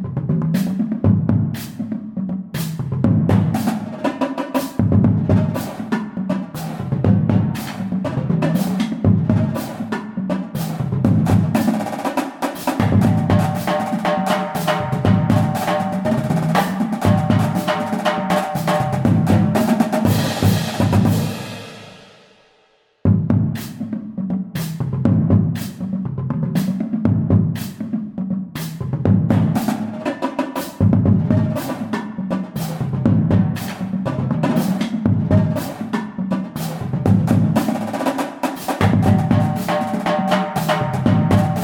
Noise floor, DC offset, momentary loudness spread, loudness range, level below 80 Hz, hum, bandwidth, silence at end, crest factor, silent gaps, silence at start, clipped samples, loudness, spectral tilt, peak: -58 dBFS; under 0.1%; 9 LU; 3 LU; -44 dBFS; none; 19 kHz; 0 s; 16 dB; none; 0 s; under 0.1%; -19 LUFS; -7 dB/octave; -2 dBFS